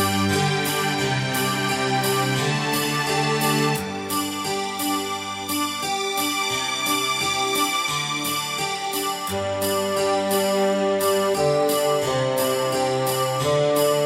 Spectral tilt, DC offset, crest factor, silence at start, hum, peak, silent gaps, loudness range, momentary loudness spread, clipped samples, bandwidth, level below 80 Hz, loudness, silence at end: -3.5 dB/octave; under 0.1%; 14 dB; 0 s; none; -8 dBFS; none; 2 LU; 4 LU; under 0.1%; 16.5 kHz; -58 dBFS; -22 LUFS; 0 s